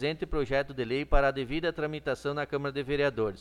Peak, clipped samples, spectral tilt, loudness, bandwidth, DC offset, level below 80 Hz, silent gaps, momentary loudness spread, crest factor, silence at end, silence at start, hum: -10 dBFS; under 0.1%; -6.5 dB/octave; -30 LUFS; 11 kHz; under 0.1%; -38 dBFS; none; 5 LU; 20 dB; 0 s; 0 s; none